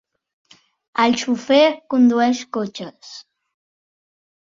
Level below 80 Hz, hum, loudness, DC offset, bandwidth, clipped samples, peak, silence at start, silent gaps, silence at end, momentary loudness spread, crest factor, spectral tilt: -66 dBFS; none; -18 LUFS; under 0.1%; 7.6 kHz; under 0.1%; -2 dBFS; 0.95 s; none; 1.4 s; 21 LU; 18 dB; -4 dB/octave